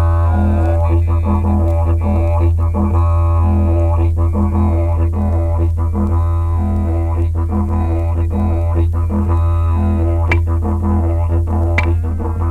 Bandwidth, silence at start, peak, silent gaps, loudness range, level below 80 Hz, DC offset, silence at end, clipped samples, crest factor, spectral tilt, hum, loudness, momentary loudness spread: 3.9 kHz; 0 s; 0 dBFS; none; 2 LU; -18 dBFS; under 0.1%; 0 s; under 0.1%; 12 dB; -9.5 dB/octave; none; -16 LUFS; 3 LU